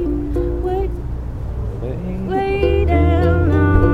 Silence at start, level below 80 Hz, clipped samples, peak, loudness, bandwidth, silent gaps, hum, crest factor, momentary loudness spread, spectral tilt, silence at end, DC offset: 0 s; -22 dBFS; under 0.1%; 0 dBFS; -19 LUFS; 5 kHz; none; none; 16 dB; 12 LU; -9.5 dB/octave; 0 s; under 0.1%